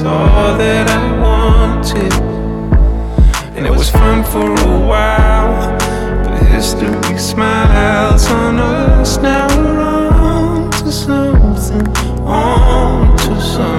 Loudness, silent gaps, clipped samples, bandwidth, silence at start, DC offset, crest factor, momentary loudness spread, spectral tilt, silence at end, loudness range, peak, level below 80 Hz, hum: -12 LUFS; none; under 0.1%; 14 kHz; 0 s; under 0.1%; 10 dB; 5 LU; -5.5 dB/octave; 0 s; 1 LU; 0 dBFS; -12 dBFS; none